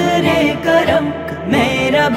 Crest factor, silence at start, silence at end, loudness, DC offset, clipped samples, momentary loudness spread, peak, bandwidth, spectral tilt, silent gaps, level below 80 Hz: 12 dB; 0 s; 0 s; -14 LUFS; under 0.1%; under 0.1%; 6 LU; -2 dBFS; 16 kHz; -5.5 dB/octave; none; -40 dBFS